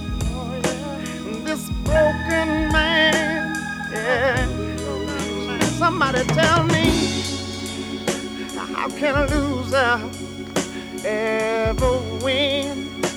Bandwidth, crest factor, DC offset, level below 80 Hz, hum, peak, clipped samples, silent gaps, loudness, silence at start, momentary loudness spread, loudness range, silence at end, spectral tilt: over 20 kHz; 18 dB; under 0.1%; -34 dBFS; none; -4 dBFS; under 0.1%; none; -21 LUFS; 0 s; 11 LU; 3 LU; 0 s; -4.5 dB/octave